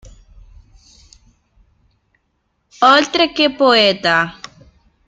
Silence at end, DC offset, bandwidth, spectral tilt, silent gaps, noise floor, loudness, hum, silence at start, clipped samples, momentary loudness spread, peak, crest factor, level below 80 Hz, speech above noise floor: 0.75 s; under 0.1%; 9.2 kHz; -3.5 dB/octave; none; -67 dBFS; -13 LUFS; none; 2.8 s; under 0.1%; 7 LU; 0 dBFS; 18 dB; -50 dBFS; 54 dB